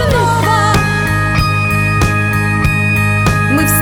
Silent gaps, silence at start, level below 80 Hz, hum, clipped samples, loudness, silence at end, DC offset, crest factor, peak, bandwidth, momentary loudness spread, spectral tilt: none; 0 s; -24 dBFS; none; under 0.1%; -12 LUFS; 0 s; under 0.1%; 10 dB; -2 dBFS; over 20 kHz; 2 LU; -5 dB/octave